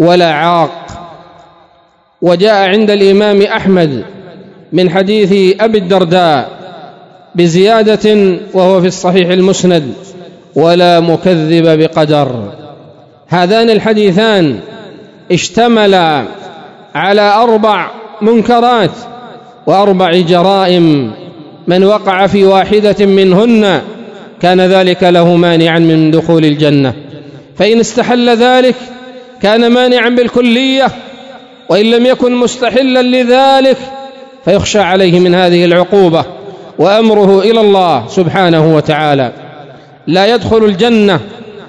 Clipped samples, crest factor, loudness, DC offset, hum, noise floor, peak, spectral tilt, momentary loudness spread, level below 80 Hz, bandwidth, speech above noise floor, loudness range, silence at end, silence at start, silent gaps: 2%; 8 dB; -8 LUFS; under 0.1%; none; -47 dBFS; 0 dBFS; -6 dB/octave; 14 LU; -46 dBFS; 11 kHz; 40 dB; 2 LU; 0 s; 0 s; none